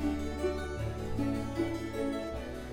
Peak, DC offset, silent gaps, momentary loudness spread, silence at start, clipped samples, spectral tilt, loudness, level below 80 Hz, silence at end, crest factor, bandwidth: -20 dBFS; under 0.1%; none; 4 LU; 0 s; under 0.1%; -6.5 dB/octave; -35 LUFS; -44 dBFS; 0 s; 14 dB; 16.5 kHz